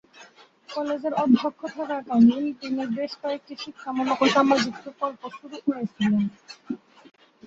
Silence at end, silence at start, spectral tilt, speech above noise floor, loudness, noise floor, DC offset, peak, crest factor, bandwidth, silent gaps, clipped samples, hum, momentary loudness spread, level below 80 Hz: 0.7 s; 0.2 s; -5.5 dB/octave; 27 dB; -24 LUFS; -52 dBFS; under 0.1%; -6 dBFS; 20 dB; 7.6 kHz; none; under 0.1%; none; 18 LU; -68 dBFS